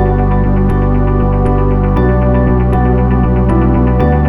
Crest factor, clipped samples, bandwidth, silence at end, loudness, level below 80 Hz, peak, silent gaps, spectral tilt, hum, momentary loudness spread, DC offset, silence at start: 10 dB; under 0.1%; 3.7 kHz; 0 s; -12 LUFS; -14 dBFS; 0 dBFS; none; -11 dB/octave; none; 1 LU; under 0.1%; 0 s